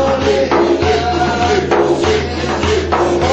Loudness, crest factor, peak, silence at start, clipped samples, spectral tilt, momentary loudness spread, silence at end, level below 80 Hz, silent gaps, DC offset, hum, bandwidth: -14 LUFS; 14 dB; 0 dBFS; 0 s; under 0.1%; -5.5 dB/octave; 3 LU; 0 s; -30 dBFS; none; under 0.1%; none; 8.4 kHz